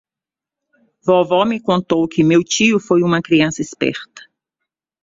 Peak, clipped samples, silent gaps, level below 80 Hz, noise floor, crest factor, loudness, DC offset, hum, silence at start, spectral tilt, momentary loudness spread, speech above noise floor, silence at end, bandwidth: -2 dBFS; under 0.1%; none; -56 dBFS; -88 dBFS; 16 dB; -16 LUFS; under 0.1%; none; 1.05 s; -5 dB/octave; 7 LU; 73 dB; 0.85 s; 7.8 kHz